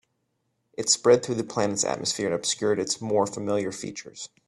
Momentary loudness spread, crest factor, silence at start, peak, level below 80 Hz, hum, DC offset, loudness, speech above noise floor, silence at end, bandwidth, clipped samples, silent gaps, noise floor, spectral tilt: 15 LU; 22 dB; 0.8 s; -6 dBFS; -66 dBFS; none; under 0.1%; -25 LUFS; 50 dB; 0.2 s; 12.5 kHz; under 0.1%; none; -75 dBFS; -3 dB/octave